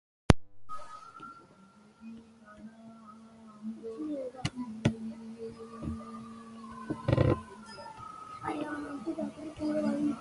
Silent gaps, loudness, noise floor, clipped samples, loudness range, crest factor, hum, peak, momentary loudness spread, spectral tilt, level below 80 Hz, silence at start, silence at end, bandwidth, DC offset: none; -35 LUFS; -58 dBFS; under 0.1%; 12 LU; 34 dB; none; 0 dBFS; 23 LU; -7 dB/octave; -48 dBFS; 0.3 s; 0 s; 11.5 kHz; under 0.1%